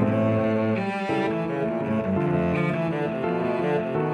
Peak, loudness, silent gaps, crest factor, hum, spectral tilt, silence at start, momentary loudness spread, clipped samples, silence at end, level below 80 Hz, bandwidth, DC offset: -10 dBFS; -25 LUFS; none; 14 dB; none; -8.5 dB/octave; 0 s; 4 LU; under 0.1%; 0 s; -56 dBFS; 10.5 kHz; under 0.1%